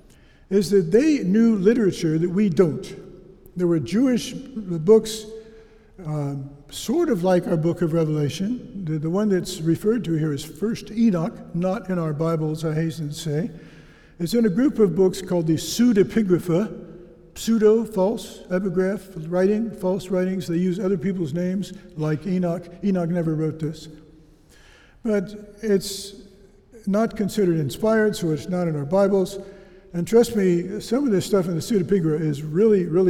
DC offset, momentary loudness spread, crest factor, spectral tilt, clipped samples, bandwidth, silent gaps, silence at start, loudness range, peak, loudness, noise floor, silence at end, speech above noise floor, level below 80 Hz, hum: under 0.1%; 13 LU; 18 dB; -6.5 dB/octave; under 0.1%; 16.5 kHz; none; 0.5 s; 5 LU; -4 dBFS; -22 LUFS; -51 dBFS; 0 s; 30 dB; -50 dBFS; none